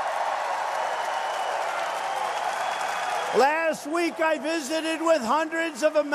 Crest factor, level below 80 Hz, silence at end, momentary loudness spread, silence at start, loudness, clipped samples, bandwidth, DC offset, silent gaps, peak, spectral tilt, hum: 18 dB; -78 dBFS; 0 s; 6 LU; 0 s; -26 LUFS; under 0.1%; 14 kHz; under 0.1%; none; -8 dBFS; -2.5 dB/octave; none